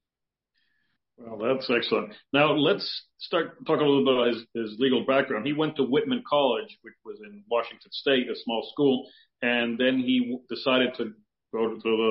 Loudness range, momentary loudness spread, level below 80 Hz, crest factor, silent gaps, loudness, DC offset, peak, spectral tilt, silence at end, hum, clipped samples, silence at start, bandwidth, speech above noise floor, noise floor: 3 LU; 13 LU; -74 dBFS; 18 dB; none; -26 LUFS; under 0.1%; -8 dBFS; -9.5 dB/octave; 0 s; none; under 0.1%; 1.2 s; 5.8 kHz; 62 dB; -88 dBFS